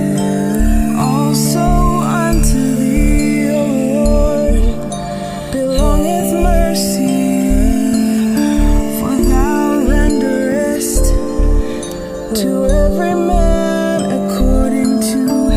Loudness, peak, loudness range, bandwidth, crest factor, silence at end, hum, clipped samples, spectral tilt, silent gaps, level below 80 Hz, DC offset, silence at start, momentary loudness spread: -14 LUFS; 0 dBFS; 2 LU; 16 kHz; 12 dB; 0 s; none; under 0.1%; -6 dB/octave; none; -18 dBFS; 3%; 0 s; 4 LU